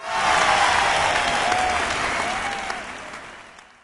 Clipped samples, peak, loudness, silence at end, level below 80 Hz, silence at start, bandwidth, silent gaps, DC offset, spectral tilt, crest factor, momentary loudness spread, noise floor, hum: under 0.1%; -6 dBFS; -20 LUFS; 0.25 s; -46 dBFS; 0 s; 11.5 kHz; none; under 0.1%; -1.5 dB/octave; 18 dB; 17 LU; -44 dBFS; none